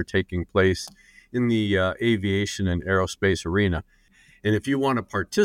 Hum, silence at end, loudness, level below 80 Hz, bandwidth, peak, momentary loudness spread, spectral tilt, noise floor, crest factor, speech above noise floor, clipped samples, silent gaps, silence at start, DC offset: none; 0 s; -24 LUFS; -46 dBFS; 15.5 kHz; -8 dBFS; 6 LU; -6 dB/octave; -57 dBFS; 16 dB; 33 dB; under 0.1%; none; 0 s; under 0.1%